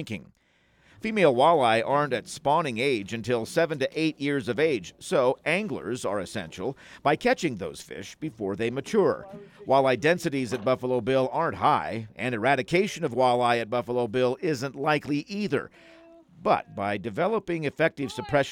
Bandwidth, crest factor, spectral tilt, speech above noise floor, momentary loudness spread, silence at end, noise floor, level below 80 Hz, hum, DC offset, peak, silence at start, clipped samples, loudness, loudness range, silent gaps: 16.5 kHz; 18 dB; -5.5 dB/octave; 37 dB; 12 LU; 0 s; -63 dBFS; -62 dBFS; none; under 0.1%; -8 dBFS; 0 s; under 0.1%; -26 LUFS; 4 LU; none